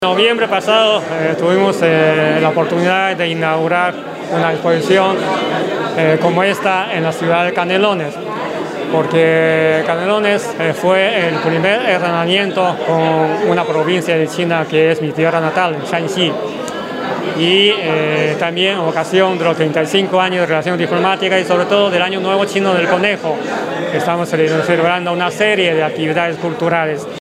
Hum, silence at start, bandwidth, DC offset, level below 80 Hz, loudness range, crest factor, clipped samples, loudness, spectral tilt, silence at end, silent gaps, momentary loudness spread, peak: none; 0 s; 14.5 kHz; under 0.1%; -62 dBFS; 2 LU; 14 dB; under 0.1%; -14 LUFS; -5 dB/octave; 0 s; none; 6 LU; 0 dBFS